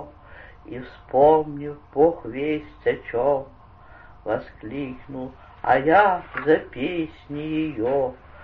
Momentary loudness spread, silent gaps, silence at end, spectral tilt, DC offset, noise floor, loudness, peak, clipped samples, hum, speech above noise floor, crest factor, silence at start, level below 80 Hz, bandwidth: 19 LU; none; 0 s; -9 dB/octave; under 0.1%; -47 dBFS; -23 LUFS; -4 dBFS; under 0.1%; none; 24 dB; 20 dB; 0 s; -50 dBFS; 5 kHz